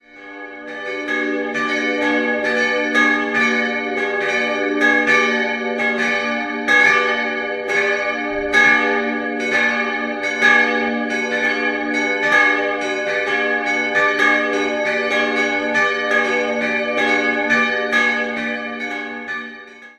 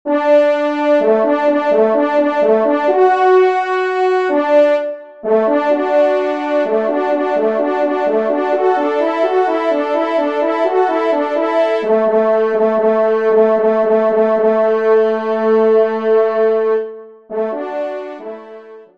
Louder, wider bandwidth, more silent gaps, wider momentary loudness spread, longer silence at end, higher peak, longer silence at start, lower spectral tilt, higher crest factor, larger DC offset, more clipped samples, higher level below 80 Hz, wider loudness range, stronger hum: second, -17 LUFS vs -14 LUFS; first, 12.5 kHz vs 7.4 kHz; neither; first, 10 LU vs 6 LU; about the same, 0.1 s vs 0.15 s; about the same, -2 dBFS vs -2 dBFS; about the same, 0.15 s vs 0.05 s; second, -3 dB/octave vs -6.5 dB/octave; first, 18 dB vs 12 dB; second, under 0.1% vs 0.3%; neither; first, -56 dBFS vs -66 dBFS; about the same, 2 LU vs 3 LU; neither